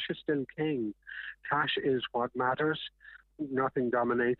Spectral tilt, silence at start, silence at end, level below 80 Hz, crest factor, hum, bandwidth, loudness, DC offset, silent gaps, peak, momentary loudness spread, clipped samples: -9 dB/octave; 0 s; 0.05 s; -68 dBFS; 18 dB; none; 4.4 kHz; -32 LUFS; under 0.1%; none; -14 dBFS; 12 LU; under 0.1%